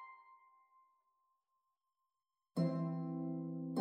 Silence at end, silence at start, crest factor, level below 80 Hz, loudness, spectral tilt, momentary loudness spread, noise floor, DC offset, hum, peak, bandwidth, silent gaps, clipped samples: 0 s; 0 s; 18 dB; under -90 dBFS; -41 LUFS; -9 dB/octave; 15 LU; under -90 dBFS; under 0.1%; none; -26 dBFS; 9 kHz; none; under 0.1%